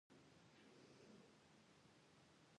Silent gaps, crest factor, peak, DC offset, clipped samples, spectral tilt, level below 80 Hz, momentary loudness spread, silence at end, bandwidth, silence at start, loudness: none; 14 dB; -56 dBFS; under 0.1%; under 0.1%; -4.5 dB/octave; under -90 dBFS; 3 LU; 0 s; 10 kHz; 0.1 s; -68 LUFS